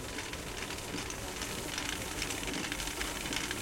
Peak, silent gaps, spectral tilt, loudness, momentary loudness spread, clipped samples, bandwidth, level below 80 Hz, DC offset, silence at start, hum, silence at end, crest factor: -18 dBFS; none; -2.5 dB/octave; -36 LUFS; 4 LU; under 0.1%; 17 kHz; -50 dBFS; under 0.1%; 0 s; none; 0 s; 20 dB